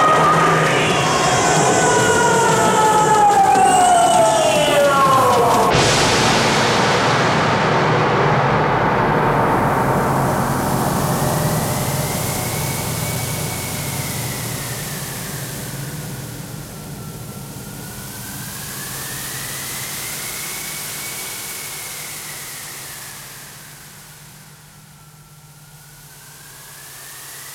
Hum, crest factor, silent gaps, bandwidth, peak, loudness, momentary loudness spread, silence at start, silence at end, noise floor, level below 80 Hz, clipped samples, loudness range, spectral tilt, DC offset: none; 16 dB; none; 18 kHz; -2 dBFS; -17 LUFS; 18 LU; 0 s; 0 s; -43 dBFS; -42 dBFS; under 0.1%; 16 LU; -3.5 dB/octave; under 0.1%